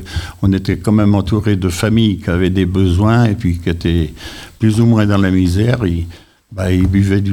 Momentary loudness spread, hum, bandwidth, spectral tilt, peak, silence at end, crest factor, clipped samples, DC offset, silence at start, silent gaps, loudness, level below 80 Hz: 10 LU; none; 14.5 kHz; -7 dB/octave; 0 dBFS; 0 s; 12 dB; under 0.1%; 0.5%; 0 s; none; -14 LUFS; -30 dBFS